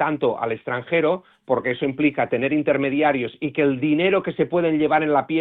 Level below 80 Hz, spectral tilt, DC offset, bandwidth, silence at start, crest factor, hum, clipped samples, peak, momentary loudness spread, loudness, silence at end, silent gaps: -60 dBFS; -10 dB/octave; under 0.1%; 4.1 kHz; 0 s; 16 dB; none; under 0.1%; -6 dBFS; 6 LU; -21 LUFS; 0 s; none